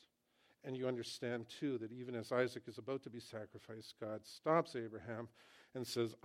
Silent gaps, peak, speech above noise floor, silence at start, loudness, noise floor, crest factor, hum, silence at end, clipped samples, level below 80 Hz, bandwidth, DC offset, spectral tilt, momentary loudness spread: none; -20 dBFS; 34 dB; 0.65 s; -43 LUFS; -76 dBFS; 24 dB; none; 0.1 s; under 0.1%; -86 dBFS; 16 kHz; under 0.1%; -5.5 dB/octave; 16 LU